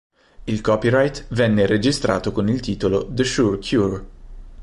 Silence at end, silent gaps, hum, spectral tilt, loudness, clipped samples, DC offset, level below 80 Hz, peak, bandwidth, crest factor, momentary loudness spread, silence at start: 0 s; none; none; -6 dB/octave; -20 LUFS; under 0.1%; under 0.1%; -40 dBFS; -4 dBFS; 11.5 kHz; 16 dB; 7 LU; 0.4 s